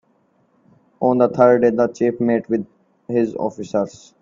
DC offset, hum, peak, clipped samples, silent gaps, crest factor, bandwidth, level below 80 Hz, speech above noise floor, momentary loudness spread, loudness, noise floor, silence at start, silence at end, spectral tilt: under 0.1%; none; 0 dBFS; under 0.1%; none; 18 dB; 7.6 kHz; -62 dBFS; 44 dB; 11 LU; -19 LUFS; -61 dBFS; 1 s; 0.3 s; -8 dB/octave